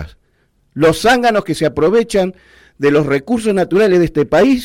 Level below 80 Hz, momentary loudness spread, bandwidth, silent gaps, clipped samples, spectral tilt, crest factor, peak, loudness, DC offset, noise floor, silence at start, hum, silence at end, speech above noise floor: -40 dBFS; 6 LU; 16.5 kHz; none; under 0.1%; -5.5 dB/octave; 10 dB; -4 dBFS; -14 LUFS; under 0.1%; -59 dBFS; 0 s; none; 0 s; 46 dB